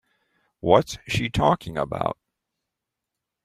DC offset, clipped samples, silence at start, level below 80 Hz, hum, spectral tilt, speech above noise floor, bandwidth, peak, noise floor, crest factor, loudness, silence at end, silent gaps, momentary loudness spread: under 0.1%; under 0.1%; 0.65 s; -48 dBFS; none; -5.5 dB/octave; 62 dB; 15.5 kHz; -2 dBFS; -84 dBFS; 24 dB; -23 LUFS; 1.3 s; none; 10 LU